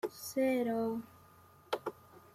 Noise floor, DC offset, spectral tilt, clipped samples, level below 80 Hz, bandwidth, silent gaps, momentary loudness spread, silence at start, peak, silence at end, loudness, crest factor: -61 dBFS; under 0.1%; -4.5 dB/octave; under 0.1%; -76 dBFS; 16 kHz; none; 13 LU; 0.05 s; -20 dBFS; 0.15 s; -36 LUFS; 18 dB